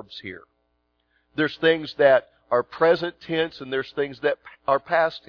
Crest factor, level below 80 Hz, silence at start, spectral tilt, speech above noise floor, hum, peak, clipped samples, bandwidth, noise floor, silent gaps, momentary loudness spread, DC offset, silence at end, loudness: 20 dB; -64 dBFS; 0.1 s; -6.5 dB/octave; 48 dB; 60 Hz at -65 dBFS; -4 dBFS; under 0.1%; 5.4 kHz; -71 dBFS; none; 16 LU; under 0.1%; 0.1 s; -23 LUFS